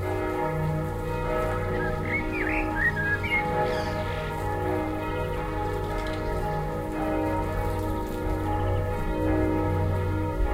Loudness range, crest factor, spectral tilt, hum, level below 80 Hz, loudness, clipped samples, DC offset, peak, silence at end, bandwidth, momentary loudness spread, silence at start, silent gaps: 3 LU; 14 dB; -7 dB/octave; none; -34 dBFS; -28 LUFS; under 0.1%; under 0.1%; -12 dBFS; 0 s; 16 kHz; 5 LU; 0 s; none